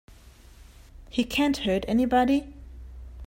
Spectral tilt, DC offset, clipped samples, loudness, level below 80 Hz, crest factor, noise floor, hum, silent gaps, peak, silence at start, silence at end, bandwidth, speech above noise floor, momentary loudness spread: -5 dB/octave; under 0.1%; under 0.1%; -25 LUFS; -44 dBFS; 18 dB; -50 dBFS; none; none; -10 dBFS; 0.6 s; 0 s; 16 kHz; 27 dB; 23 LU